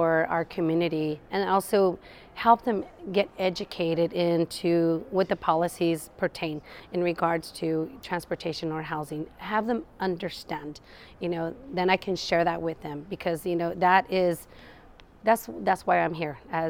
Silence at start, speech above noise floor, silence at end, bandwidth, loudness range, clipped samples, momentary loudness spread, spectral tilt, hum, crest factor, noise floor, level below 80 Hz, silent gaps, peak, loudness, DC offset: 0 s; 24 dB; 0 s; 17 kHz; 5 LU; under 0.1%; 11 LU; -5.5 dB/octave; none; 20 dB; -52 dBFS; -58 dBFS; none; -6 dBFS; -27 LUFS; under 0.1%